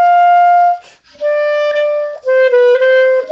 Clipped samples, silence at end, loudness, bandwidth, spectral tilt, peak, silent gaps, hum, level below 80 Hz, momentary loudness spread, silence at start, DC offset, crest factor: under 0.1%; 0 s; -11 LUFS; 7 kHz; -1 dB/octave; -2 dBFS; none; none; -68 dBFS; 9 LU; 0 s; under 0.1%; 8 dB